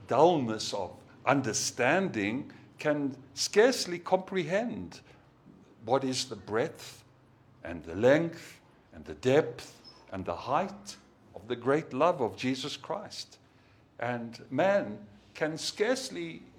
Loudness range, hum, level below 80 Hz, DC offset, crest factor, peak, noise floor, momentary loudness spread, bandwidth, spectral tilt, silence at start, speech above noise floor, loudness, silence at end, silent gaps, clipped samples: 5 LU; none; -68 dBFS; under 0.1%; 24 dB; -8 dBFS; -61 dBFS; 21 LU; 18 kHz; -4 dB/octave; 0 s; 31 dB; -30 LUFS; 0.15 s; none; under 0.1%